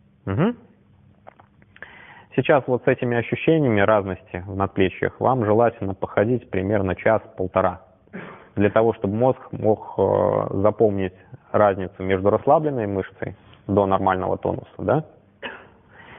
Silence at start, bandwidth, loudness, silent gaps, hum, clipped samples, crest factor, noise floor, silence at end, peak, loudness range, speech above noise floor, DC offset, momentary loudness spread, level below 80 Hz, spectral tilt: 0.25 s; 3.8 kHz; -21 LUFS; none; none; under 0.1%; 20 dB; -54 dBFS; 0 s; -2 dBFS; 3 LU; 33 dB; under 0.1%; 16 LU; -58 dBFS; -12 dB/octave